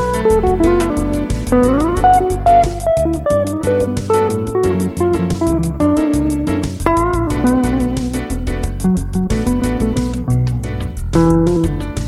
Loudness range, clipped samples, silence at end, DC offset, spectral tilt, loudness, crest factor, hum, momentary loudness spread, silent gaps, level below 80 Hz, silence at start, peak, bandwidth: 3 LU; under 0.1%; 0 s; under 0.1%; -7 dB/octave; -16 LUFS; 14 dB; none; 7 LU; none; -24 dBFS; 0 s; 0 dBFS; 15.5 kHz